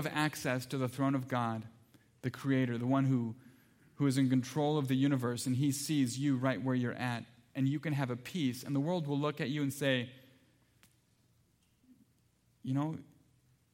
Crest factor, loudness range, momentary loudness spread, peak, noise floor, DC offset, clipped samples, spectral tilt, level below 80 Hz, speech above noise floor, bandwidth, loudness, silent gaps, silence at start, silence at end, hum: 20 dB; 8 LU; 11 LU; -16 dBFS; -72 dBFS; under 0.1%; under 0.1%; -6 dB/octave; -76 dBFS; 39 dB; 16.5 kHz; -34 LUFS; none; 0 s; 0.7 s; none